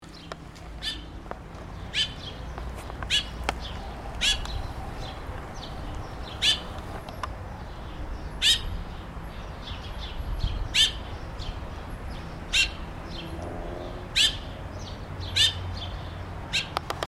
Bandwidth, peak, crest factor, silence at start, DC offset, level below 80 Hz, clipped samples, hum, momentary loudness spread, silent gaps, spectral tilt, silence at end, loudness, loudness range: 16 kHz; -6 dBFS; 24 dB; 0 s; under 0.1%; -38 dBFS; under 0.1%; none; 18 LU; none; -2.5 dB/octave; 0.15 s; -28 LUFS; 4 LU